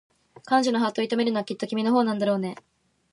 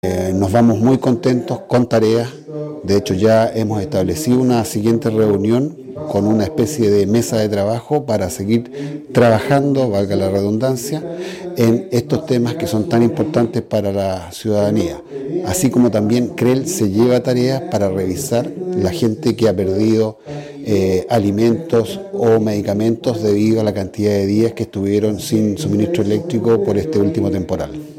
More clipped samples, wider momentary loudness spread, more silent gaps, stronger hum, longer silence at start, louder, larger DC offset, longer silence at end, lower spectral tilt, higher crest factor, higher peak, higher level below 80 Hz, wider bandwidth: neither; about the same, 7 LU vs 8 LU; neither; neither; first, 0.45 s vs 0.05 s; second, -25 LUFS vs -16 LUFS; neither; first, 0.6 s vs 0 s; about the same, -5.5 dB/octave vs -6.5 dB/octave; about the same, 16 dB vs 14 dB; second, -8 dBFS vs -2 dBFS; second, -76 dBFS vs -48 dBFS; second, 11.5 kHz vs 16.5 kHz